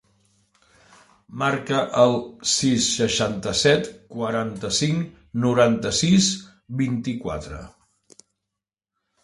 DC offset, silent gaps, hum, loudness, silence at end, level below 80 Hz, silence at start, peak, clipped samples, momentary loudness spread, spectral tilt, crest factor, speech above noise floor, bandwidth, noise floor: under 0.1%; none; none; -22 LUFS; 1.55 s; -50 dBFS; 1.3 s; -2 dBFS; under 0.1%; 13 LU; -4 dB/octave; 20 dB; 64 dB; 11.5 kHz; -86 dBFS